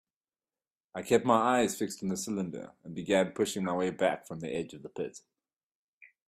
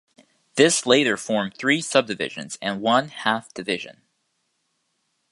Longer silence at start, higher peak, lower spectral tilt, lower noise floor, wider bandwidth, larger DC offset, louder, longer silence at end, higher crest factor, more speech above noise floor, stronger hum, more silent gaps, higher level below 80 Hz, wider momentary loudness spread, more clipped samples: first, 0.95 s vs 0.55 s; second, -10 dBFS vs -2 dBFS; first, -4.5 dB/octave vs -3 dB/octave; first, under -90 dBFS vs -73 dBFS; first, 15.5 kHz vs 11.5 kHz; neither; second, -31 LUFS vs -22 LUFS; second, 0.2 s vs 1.4 s; about the same, 22 dB vs 22 dB; first, over 59 dB vs 51 dB; neither; first, 5.63-6.01 s vs none; about the same, -70 dBFS vs -70 dBFS; first, 16 LU vs 11 LU; neither